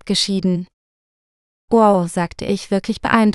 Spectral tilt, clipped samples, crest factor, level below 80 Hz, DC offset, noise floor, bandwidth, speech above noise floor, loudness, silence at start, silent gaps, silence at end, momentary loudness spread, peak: -5 dB/octave; under 0.1%; 18 dB; -48 dBFS; under 0.1%; under -90 dBFS; 12 kHz; over 73 dB; -18 LUFS; 0.05 s; 0.73-1.68 s; 0 s; 10 LU; 0 dBFS